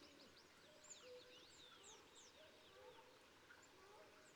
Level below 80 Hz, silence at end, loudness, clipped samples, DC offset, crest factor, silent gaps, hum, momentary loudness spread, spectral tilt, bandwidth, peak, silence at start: -88 dBFS; 0 s; -64 LUFS; under 0.1%; under 0.1%; 18 dB; none; none; 6 LU; -1.5 dB/octave; 19.5 kHz; -48 dBFS; 0 s